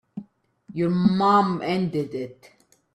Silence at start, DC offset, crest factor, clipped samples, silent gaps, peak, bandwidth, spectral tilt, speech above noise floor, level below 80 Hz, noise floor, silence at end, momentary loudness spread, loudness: 0.15 s; under 0.1%; 16 dB; under 0.1%; none; -8 dBFS; 9.8 kHz; -8 dB/octave; 28 dB; -62 dBFS; -50 dBFS; 0.6 s; 19 LU; -22 LUFS